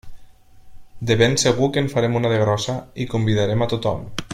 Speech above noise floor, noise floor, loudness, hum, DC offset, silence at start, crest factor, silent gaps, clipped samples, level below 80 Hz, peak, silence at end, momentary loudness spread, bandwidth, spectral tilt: 24 dB; -43 dBFS; -20 LUFS; none; under 0.1%; 0.05 s; 20 dB; none; under 0.1%; -46 dBFS; -2 dBFS; 0 s; 10 LU; 14.5 kHz; -5 dB/octave